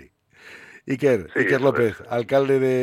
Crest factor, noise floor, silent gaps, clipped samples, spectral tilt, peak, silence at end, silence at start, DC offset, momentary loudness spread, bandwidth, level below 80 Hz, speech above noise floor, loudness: 16 dB; -49 dBFS; none; under 0.1%; -7 dB/octave; -6 dBFS; 0 s; 0.45 s; under 0.1%; 11 LU; 15 kHz; -60 dBFS; 29 dB; -21 LUFS